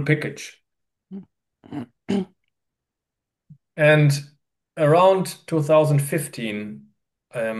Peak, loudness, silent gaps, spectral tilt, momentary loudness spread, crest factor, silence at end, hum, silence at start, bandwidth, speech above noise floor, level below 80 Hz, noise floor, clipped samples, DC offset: -4 dBFS; -20 LUFS; none; -6 dB/octave; 24 LU; 18 dB; 0 s; none; 0 s; 12.5 kHz; 65 dB; -70 dBFS; -85 dBFS; under 0.1%; under 0.1%